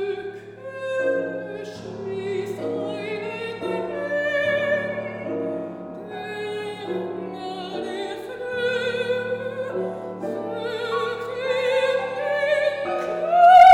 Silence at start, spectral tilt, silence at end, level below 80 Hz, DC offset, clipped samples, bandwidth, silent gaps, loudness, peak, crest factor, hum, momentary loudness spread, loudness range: 0 s; -5 dB/octave; 0 s; -64 dBFS; under 0.1%; under 0.1%; 11.5 kHz; none; -24 LUFS; -4 dBFS; 18 dB; none; 11 LU; 5 LU